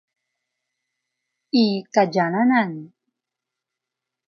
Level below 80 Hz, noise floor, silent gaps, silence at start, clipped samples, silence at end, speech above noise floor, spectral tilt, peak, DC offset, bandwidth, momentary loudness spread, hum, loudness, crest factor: -82 dBFS; -85 dBFS; none; 1.55 s; under 0.1%; 1.4 s; 66 dB; -6 dB/octave; -4 dBFS; under 0.1%; 7 kHz; 7 LU; none; -20 LUFS; 20 dB